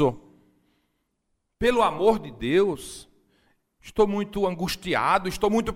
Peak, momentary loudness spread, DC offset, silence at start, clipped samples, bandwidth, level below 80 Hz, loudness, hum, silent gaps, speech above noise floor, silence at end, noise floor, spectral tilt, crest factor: -6 dBFS; 13 LU; under 0.1%; 0 s; under 0.1%; 16 kHz; -48 dBFS; -24 LUFS; none; none; 52 dB; 0 s; -76 dBFS; -5.5 dB/octave; 20 dB